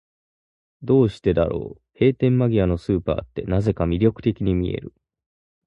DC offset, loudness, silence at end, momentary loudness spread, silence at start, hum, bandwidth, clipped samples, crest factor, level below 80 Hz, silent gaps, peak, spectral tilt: under 0.1%; -21 LUFS; 0.75 s; 9 LU; 0.8 s; none; 8.2 kHz; under 0.1%; 18 dB; -38 dBFS; none; -4 dBFS; -9.5 dB/octave